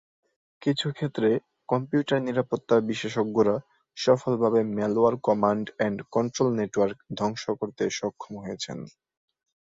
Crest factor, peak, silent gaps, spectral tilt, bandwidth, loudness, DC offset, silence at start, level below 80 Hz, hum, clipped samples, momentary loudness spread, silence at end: 20 dB; -8 dBFS; none; -6 dB/octave; 7.8 kHz; -26 LUFS; under 0.1%; 0.6 s; -64 dBFS; none; under 0.1%; 11 LU; 0.8 s